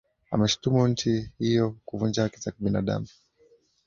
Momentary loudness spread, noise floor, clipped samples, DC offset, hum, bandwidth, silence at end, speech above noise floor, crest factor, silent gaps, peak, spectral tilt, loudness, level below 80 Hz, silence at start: 8 LU; -62 dBFS; under 0.1%; under 0.1%; none; 7.6 kHz; 0.8 s; 36 dB; 18 dB; none; -8 dBFS; -6 dB/octave; -26 LUFS; -52 dBFS; 0.3 s